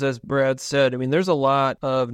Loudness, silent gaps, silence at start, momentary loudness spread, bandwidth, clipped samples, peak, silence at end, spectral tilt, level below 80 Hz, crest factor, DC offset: -21 LUFS; none; 0 s; 3 LU; 14.5 kHz; under 0.1%; -6 dBFS; 0 s; -5.5 dB/octave; -58 dBFS; 14 dB; under 0.1%